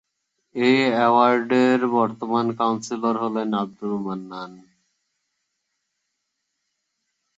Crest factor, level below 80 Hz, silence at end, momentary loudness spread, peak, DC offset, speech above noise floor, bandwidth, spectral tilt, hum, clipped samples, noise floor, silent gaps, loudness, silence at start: 20 dB; -70 dBFS; 2.75 s; 14 LU; -4 dBFS; under 0.1%; 57 dB; 8 kHz; -5.5 dB/octave; none; under 0.1%; -78 dBFS; none; -21 LUFS; 0.55 s